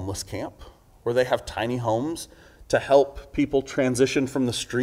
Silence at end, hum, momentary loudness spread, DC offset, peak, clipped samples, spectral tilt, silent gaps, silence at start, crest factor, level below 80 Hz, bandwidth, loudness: 0 s; none; 13 LU; under 0.1%; -6 dBFS; under 0.1%; -5 dB/octave; none; 0 s; 20 dB; -48 dBFS; 16 kHz; -24 LUFS